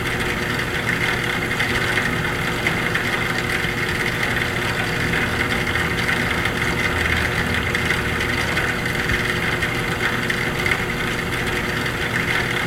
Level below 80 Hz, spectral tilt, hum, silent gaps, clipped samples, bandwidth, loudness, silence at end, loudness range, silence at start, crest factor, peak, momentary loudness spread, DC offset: -36 dBFS; -4 dB/octave; none; none; under 0.1%; 16.5 kHz; -20 LUFS; 0 s; 1 LU; 0 s; 18 dB; -4 dBFS; 2 LU; under 0.1%